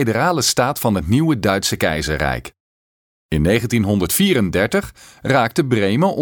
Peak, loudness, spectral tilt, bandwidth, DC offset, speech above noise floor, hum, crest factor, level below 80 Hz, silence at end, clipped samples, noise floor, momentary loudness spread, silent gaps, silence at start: -2 dBFS; -17 LUFS; -4.5 dB/octave; 19 kHz; under 0.1%; over 73 dB; none; 16 dB; -36 dBFS; 0 s; under 0.1%; under -90 dBFS; 6 LU; 2.60-3.29 s; 0 s